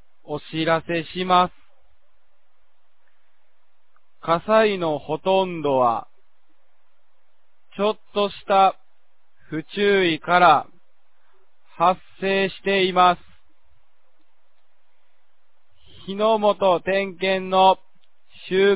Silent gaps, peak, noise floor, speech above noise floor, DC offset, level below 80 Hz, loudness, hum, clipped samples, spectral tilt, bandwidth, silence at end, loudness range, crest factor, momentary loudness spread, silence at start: none; -2 dBFS; -70 dBFS; 50 dB; 0.8%; -60 dBFS; -20 LUFS; none; under 0.1%; -9 dB/octave; 4 kHz; 0 s; 6 LU; 20 dB; 13 LU; 0.3 s